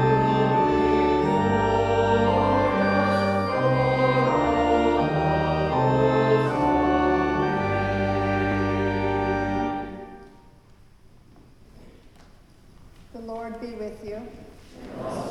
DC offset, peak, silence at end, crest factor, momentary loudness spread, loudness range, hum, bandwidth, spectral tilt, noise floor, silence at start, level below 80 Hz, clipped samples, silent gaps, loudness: under 0.1%; -8 dBFS; 0 s; 14 dB; 15 LU; 18 LU; none; 11.5 kHz; -7.5 dB/octave; -52 dBFS; 0 s; -42 dBFS; under 0.1%; none; -22 LUFS